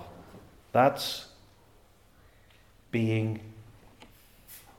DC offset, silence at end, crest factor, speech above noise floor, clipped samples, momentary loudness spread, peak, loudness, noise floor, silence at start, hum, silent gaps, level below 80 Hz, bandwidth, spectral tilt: under 0.1%; 0.2 s; 22 dB; 33 dB; under 0.1%; 26 LU; -10 dBFS; -29 LUFS; -60 dBFS; 0 s; none; none; -62 dBFS; 18 kHz; -6 dB/octave